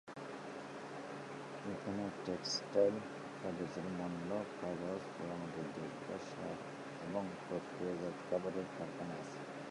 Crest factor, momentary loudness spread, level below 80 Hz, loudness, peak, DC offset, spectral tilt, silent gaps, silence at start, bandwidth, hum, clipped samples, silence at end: 22 dB; 9 LU; -74 dBFS; -43 LUFS; -20 dBFS; under 0.1%; -5 dB/octave; none; 0.05 s; 11.5 kHz; none; under 0.1%; 0 s